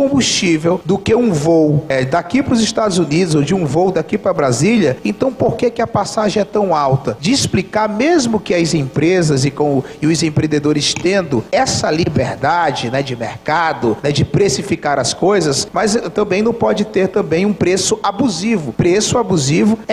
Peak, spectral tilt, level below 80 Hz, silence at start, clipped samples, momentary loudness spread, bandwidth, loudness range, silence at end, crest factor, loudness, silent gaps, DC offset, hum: -2 dBFS; -5 dB/octave; -44 dBFS; 0 s; under 0.1%; 4 LU; 14 kHz; 2 LU; 0 s; 12 dB; -15 LUFS; none; under 0.1%; none